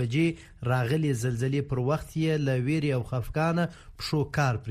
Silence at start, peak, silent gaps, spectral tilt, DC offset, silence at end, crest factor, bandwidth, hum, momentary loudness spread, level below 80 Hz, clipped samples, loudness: 0 s; -12 dBFS; none; -7 dB/octave; under 0.1%; 0 s; 14 dB; 15 kHz; none; 4 LU; -48 dBFS; under 0.1%; -28 LUFS